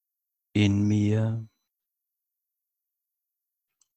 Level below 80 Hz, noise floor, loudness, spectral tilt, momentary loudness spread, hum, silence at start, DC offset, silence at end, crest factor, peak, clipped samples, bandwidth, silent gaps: -52 dBFS; -85 dBFS; -25 LUFS; -7 dB/octave; 8 LU; none; 0.55 s; under 0.1%; 2.5 s; 20 dB; -10 dBFS; under 0.1%; 8.4 kHz; none